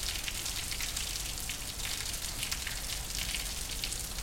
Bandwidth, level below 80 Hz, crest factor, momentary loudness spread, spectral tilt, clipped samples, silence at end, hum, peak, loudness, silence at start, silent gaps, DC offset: 17 kHz; -44 dBFS; 22 dB; 2 LU; -1 dB/octave; under 0.1%; 0 s; none; -14 dBFS; -35 LUFS; 0 s; none; under 0.1%